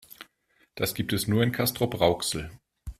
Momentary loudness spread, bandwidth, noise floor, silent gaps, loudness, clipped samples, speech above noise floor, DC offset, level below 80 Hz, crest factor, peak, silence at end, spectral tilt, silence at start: 21 LU; 16 kHz; -67 dBFS; none; -27 LUFS; under 0.1%; 41 dB; under 0.1%; -50 dBFS; 22 dB; -8 dBFS; 0.1 s; -4.5 dB/octave; 0.1 s